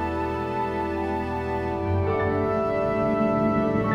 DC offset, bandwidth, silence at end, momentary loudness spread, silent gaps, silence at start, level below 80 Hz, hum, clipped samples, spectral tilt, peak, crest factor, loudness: under 0.1%; 12 kHz; 0 s; 5 LU; none; 0 s; -42 dBFS; none; under 0.1%; -8.5 dB/octave; -10 dBFS; 14 dB; -25 LUFS